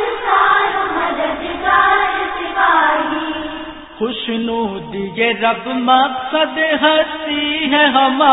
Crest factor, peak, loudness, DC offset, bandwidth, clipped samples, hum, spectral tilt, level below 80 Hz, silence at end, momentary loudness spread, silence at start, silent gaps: 16 dB; 0 dBFS; -15 LUFS; under 0.1%; 4 kHz; under 0.1%; none; -9 dB/octave; -48 dBFS; 0 s; 11 LU; 0 s; none